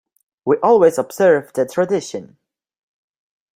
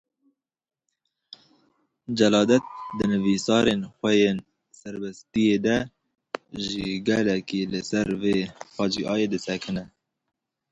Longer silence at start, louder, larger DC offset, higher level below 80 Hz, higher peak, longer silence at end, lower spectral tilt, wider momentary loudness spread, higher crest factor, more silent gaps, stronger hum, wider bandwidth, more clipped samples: second, 0.45 s vs 2.1 s; first, -16 LUFS vs -24 LUFS; neither; second, -64 dBFS vs -56 dBFS; first, -2 dBFS vs -6 dBFS; first, 1.3 s vs 0.85 s; about the same, -5.5 dB/octave vs -5 dB/octave; about the same, 15 LU vs 15 LU; about the same, 16 dB vs 20 dB; neither; neither; first, 16 kHz vs 8.2 kHz; neither